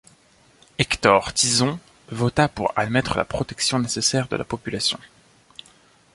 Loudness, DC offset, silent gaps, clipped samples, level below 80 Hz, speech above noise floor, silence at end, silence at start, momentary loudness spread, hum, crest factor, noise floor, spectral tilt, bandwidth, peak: -21 LUFS; under 0.1%; none; under 0.1%; -48 dBFS; 34 dB; 1.1 s; 0.8 s; 11 LU; none; 22 dB; -56 dBFS; -3.5 dB/octave; 11.5 kHz; -2 dBFS